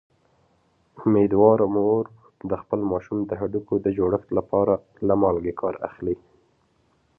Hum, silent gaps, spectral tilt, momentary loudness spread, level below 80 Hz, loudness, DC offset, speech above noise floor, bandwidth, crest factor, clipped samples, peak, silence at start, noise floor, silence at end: none; none; -12 dB/octave; 13 LU; -52 dBFS; -23 LUFS; under 0.1%; 43 dB; 3.1 kHz; 20 dB; under 0.1%; -4 dBFS; 0.95 s; -65 dBFS; 1 s